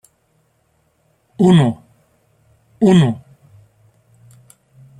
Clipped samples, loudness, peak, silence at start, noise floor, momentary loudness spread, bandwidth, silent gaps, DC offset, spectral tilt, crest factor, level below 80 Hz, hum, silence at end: under 0.1%; -14 LUFS; -2 dBFS; 1.4 s; -62 dBFS; 16 LU; 11 kHz; none; under 0.1%; -7.5 dB/octave; 18 dB; -54 dBFS; none; 1.8 s